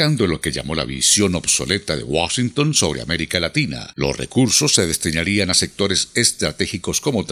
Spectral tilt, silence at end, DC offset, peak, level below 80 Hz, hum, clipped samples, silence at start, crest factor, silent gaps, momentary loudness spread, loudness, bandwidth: -3 dB/octave; 0 s; under 0.1%; 0 dBFS; -42 dBFS; none; under 0.1%; 0 s; 20 dB; none; 8 LU; -18 LUFS; 15.5 kHz